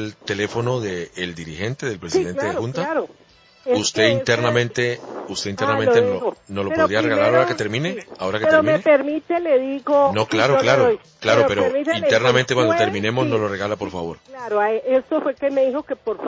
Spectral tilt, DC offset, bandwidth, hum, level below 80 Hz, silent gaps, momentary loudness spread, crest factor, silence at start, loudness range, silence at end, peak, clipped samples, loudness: -5 dB/octave; under 0.1%; 7.8 kHz; none; -52 dBFS; none; 11 LU; 16 dB; 0 s; 5 LU; 0 s; -2 dBFS; under 0.1%; -19 LUFS